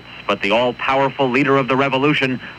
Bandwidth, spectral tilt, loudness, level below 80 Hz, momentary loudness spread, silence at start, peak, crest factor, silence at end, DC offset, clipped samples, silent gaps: 9.8 kHz; -6 dB/octave; -17 LUFS; -52 dBFS; 3 LU; 0 s; -2 dBFS; 14 dB; 0 s; under 0.1%; under 0.1%; none